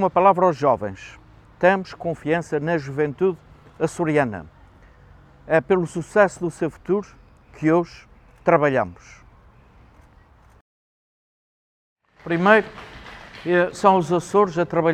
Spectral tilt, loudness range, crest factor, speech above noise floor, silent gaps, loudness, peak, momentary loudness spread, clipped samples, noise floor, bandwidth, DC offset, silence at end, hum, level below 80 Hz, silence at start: -6.5 dB/octave; 5 LU; 22 dB; 32 dB; 10.61-11.96 s; -21 LUFS; 0 dBFS; 17 LU; under 0.1%; -52 dBFS; 11.5 kHz; under 0.1%; 0 s; none; -54 dBFS; 0 s